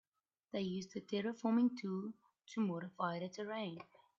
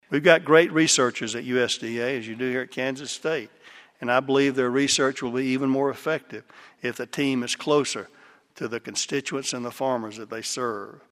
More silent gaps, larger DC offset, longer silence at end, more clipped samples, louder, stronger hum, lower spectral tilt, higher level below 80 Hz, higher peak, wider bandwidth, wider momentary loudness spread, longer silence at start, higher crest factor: neither; neither; first, 0.35 s vs 0.2 s; neither; second, -41 LUFS vs -24 LUFS; neither; first, -5.5 dB/octave vs -3.5 dB/octave; second, -84 dBFS vs -68 dBFS; second, -24 dBFS vs 0 dBFS; second, 7.4 kHz vs 15 kHz; about the same, 13 LU vs 14 LU; first, 0.55 s vs 0.1 s; second, 18 dB vs 24 dB